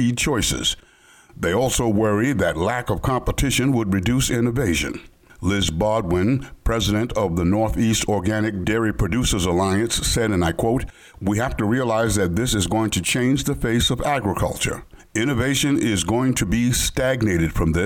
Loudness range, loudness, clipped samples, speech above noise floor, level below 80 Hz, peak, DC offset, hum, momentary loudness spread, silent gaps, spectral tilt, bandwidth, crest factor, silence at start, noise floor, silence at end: 1 LU; -21 LUFS; under 0.1%; 29 dB; -34 dBFS; -10 dBFS; under 0.1%; none; 4 LU; none; -4.5 dB/octave; 19 kHz; 10 dB; 0 s; -50 dBFS; 0 s